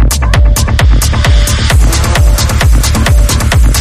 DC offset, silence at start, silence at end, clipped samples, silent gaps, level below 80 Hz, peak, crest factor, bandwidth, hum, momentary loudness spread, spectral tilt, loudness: under 0.1%; 0 s; 0 s; under 0.1%; none; -8 dBFS; 0 dBFS; 6 dB; 16 kHz; none; 1 LU; -4 dB/octave; -9 LUFS